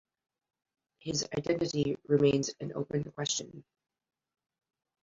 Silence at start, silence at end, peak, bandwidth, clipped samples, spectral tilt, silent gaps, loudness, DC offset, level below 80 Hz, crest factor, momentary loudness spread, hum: 1.05 s; 1.4 s; -14 dBFS; 7.8 kHz; under 0.1%; -4.5 dB/octave; none; -32 LUFS; under 0.1%; -66 dBFS; 20 dB; 10 LU; none